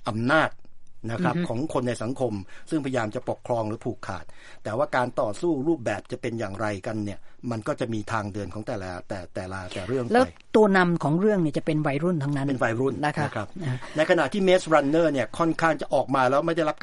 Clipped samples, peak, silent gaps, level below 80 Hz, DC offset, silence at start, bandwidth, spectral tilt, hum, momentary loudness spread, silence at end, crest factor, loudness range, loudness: under 0.1%; -4 dBFS; none; -52 dBFS; under 0.1%; 0 s; 11.5 kHz; -6.5 dB/octave; none; 12 LU; 0.05 s; 22 dB; 7 LU; -25 LUFS